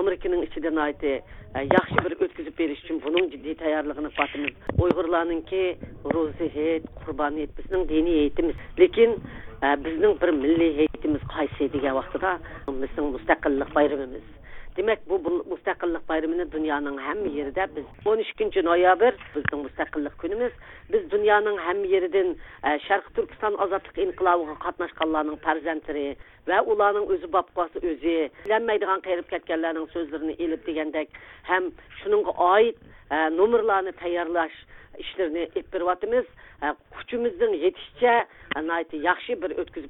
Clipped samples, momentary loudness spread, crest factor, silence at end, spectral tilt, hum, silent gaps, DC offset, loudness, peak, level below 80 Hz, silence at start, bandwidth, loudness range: under 0.1%; 10 LU; 22 dB; 0 s; -8.5 dB/octave; none; none; under 0.1%; -25 LUFS; -4 dBFS; -46 dBFS; 0 s; 4 kHz; 4 LU